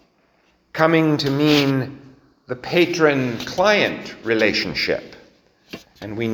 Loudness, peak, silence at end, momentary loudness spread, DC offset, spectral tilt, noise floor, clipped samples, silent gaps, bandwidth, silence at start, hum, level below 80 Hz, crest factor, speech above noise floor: -19 LUFS; 0 dBFS; 0 s; 17 LU; under 0.1%; -5.5 dB/octave; -60 dBFS; under 0.1%; none; over 20 kHz; 0.75 s; none; -54 dBFS; 20 dB; 42 dB